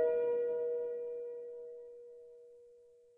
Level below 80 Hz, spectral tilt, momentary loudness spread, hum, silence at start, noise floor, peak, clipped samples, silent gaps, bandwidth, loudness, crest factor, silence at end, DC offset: -86 dBFS; -7 dB/octave; 23 LU; none; 0 s; -62 dBFS; -24 dBFS; under 0.1%; none; 3 kHz; -37 LUFS; 14 dB; 0.35 s; under 0.1%